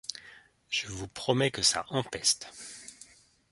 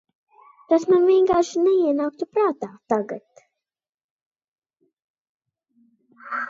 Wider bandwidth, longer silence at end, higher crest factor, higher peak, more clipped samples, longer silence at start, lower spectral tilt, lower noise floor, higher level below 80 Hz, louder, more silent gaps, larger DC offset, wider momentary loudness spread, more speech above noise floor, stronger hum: first, 11.5 kHz vs 7.6 kHz; first, 0.45 s vs 0 s; first, 24 dB vs 18 dB; second, -10 dBFS vs -6 dBFS; neither; second, 0.1 s vs 0.7 s; second, -2.5 dB/octave vs -5.5 dB/octave; second, -57 dBFS vs under -90 dBFS; about the same, -60 dBFS vs -64 dBFS; second, -29 LUFS vs -20 LUFS; second, none vs 3.89-3.98 s, 4.04-4.31 s, 4.48-4.56 s, 4.93-4.97 s, 5.04-5.40 s; neither; first, 19 LU vs 15 LU; second, 26 dB vs over 70 dB; neither